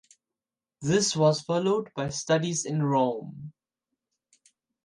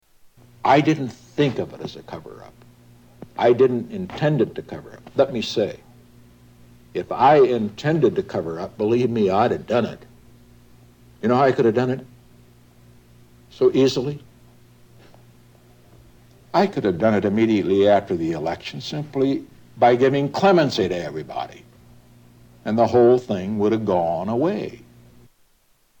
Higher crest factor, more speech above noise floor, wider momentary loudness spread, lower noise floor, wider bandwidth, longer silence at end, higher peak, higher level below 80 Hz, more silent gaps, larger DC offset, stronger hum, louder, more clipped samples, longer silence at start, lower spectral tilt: about the same, 18 dB vs 18 dB; first, over 64 dB vs 41 dB; about the same, 14 LU vs 15 LU; first, under -90 dBFS vs -60 dBFS; second, 11.5 kHz vs 18 kHz; about the same, 1.35 s vs 1.25 s; second, -10 dBFS vs -4 dBFS; second, -66 dBFS vs -56 dBFS; neither; neither; second, none vs 60 Hz at -50 dBFS; second, -26 LUFS vs -20 LUFS; neither; first, 0.8 s vs 0.65 s; second, -4.5 dB/octave vs -7 dB/octave